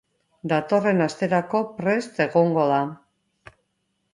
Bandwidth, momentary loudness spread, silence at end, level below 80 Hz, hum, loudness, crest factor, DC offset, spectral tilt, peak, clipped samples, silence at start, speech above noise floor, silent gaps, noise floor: 11 kHz; 6 LU; 1.2 s; -68 dBFS; none; -22 LUFS; 18 dB; under 0.1%; -7 dB/octave; -6 dBFS; under 0.1%; 0.45 s; 52 dB; none; -74 dBFS